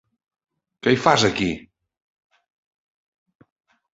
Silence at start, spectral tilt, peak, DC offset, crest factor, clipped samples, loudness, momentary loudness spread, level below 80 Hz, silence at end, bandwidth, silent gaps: 0.85 s; -4.5 dB/octave; -2 dBFS; under 0.1%; 24 dB; under 0.1%; -20 LUFS; 10 LU; -54 dBFS; 2.35 s; 8 kHz; none